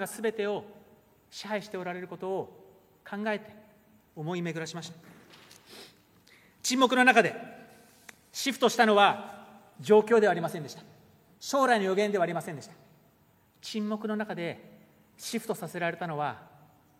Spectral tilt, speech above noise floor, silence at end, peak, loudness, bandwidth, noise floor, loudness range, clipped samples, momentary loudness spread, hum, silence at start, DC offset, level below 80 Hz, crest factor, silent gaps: -4 dB/octave; 36 dB; 0.55 s; -6 dBFS; -28 LUFS; 16 kHz; -64 dBFS; 12 LU; under 0.1%; 23 LU; none; 0 s; under 0.1%; -78 dBFS; 24 dB; none